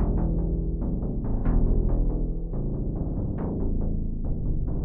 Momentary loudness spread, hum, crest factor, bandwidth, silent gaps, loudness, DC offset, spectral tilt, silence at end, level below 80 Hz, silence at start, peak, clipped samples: 5 LU; none; 12 dB; 2 kHz; none; -29 LUFS; under 0.1%; -14.5 dB/octave; 0 s; -26 dBFS; 0 s; -12 dBFS; under 0.1%